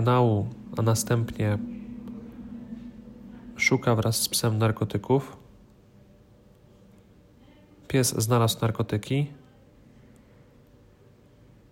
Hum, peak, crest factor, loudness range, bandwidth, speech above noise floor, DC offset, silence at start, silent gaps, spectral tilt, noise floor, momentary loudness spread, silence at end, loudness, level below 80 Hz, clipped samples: none; -8 dBFS; 20 dB; 6 LU; 16 kHz; 31 dB; under 0.1%; 0 s; none; -5 dB/octave; -55 dBFS; 19 LU; 2.35 s; -25 LUFS; -56 dBFS; under 0.1%